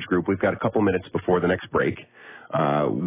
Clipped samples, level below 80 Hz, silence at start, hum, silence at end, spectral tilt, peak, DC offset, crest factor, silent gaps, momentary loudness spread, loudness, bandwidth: under 0.1%; -50 dBFS; 0 s; none; 0 s; -11 dB/octave; -8 dBFS; under 0.1%; 16 dB; none; 11 LU; -24 LUFS; 3.9 kHz